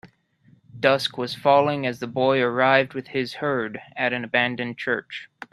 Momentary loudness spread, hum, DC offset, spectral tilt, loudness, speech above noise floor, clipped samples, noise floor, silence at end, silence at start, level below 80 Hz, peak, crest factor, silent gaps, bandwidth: 9 LU; none; under 0.1%; -5.5 dB/octave; -23 LUFS; 35 dB; under 0.1%; -58 dBFS; 0.05 s; 0.05 s; -66 dBFS; 0 dBFS; 22 dB; none; 13.5 kHz